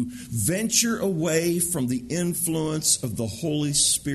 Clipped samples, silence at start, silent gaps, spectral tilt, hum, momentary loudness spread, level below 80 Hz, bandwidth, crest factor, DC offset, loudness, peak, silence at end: under 0.1%; 0 s; none; -3.5 dB/octave; none; 7 LU; -52 dBFS; 12.5 kHz; 18 dB; under 0.1%; -23 LUFS; -6 dBFS; 0 s